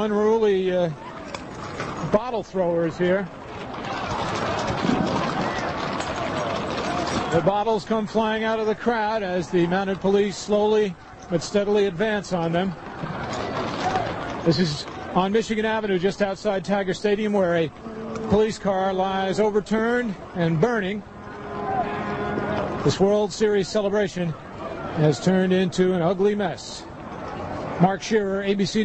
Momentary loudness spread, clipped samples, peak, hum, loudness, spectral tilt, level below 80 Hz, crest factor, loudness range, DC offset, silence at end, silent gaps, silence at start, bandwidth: 11 LU; under 0.1%; -4 dBFS; none; -23 LUFS; -6 dB/octave; -48 dBFS; 20 dB; 3 LU; under 0.1%; 0 s; none; 0 s; 8.6 kHz